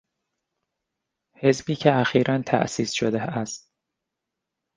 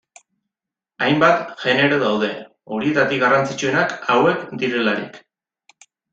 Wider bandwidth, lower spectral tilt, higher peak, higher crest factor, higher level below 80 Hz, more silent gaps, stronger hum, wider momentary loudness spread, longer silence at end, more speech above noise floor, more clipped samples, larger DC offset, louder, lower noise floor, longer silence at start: first, 10 kHz vs 8 kHz; about the same, -5.5 dB/octave vs -5 dB/octave; about the same, -2 dBFS vs -2 dBFS; about the same, 22 dB vs 18 dB; about the same, -62 dBFS vs -62 dBFS; neither; neither; about the same, 10 LU vs 9 LU; first, 1.2 s vs 0.95 s; second, 61 dB vs 69 dB; neither; neither; second, -23 LUFS vs -18 LUFS; about the same, -84 dBFS vs -87 dBFS; first, 1.4 s vs 1 s